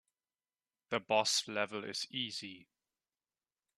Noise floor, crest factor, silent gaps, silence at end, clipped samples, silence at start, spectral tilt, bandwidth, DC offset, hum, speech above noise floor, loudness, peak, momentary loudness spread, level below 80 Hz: under -90 dBFS; 26 dB; none; 1.15 s; under 0.1%; 0.9 s; -1.5 dB/octave; 13.5 kHz; under 0.1%; none; over 53 dB; -35 LUFS; -14 dBFS; 10 LU; -84 dBFS